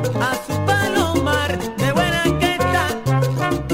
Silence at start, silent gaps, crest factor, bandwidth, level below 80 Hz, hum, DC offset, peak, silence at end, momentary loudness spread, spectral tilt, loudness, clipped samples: 0 s; none; 14 dB; 16.5 kHz; -38 dBFS; none; under 0.1%; -4 dBFS; 0 s; 4 LU; -5 dB/octave; -19 LUFS; under 0.1%